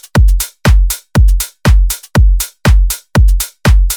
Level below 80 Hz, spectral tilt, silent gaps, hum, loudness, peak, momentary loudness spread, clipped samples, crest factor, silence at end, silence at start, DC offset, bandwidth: -10 dBFS; -5 dB/octave; none; none; -12 LUFS; 0 dBFS; 2 LU; under 0.1%; 8 dB; 0 s; 0.15 s; under 0.1%; 19 kHz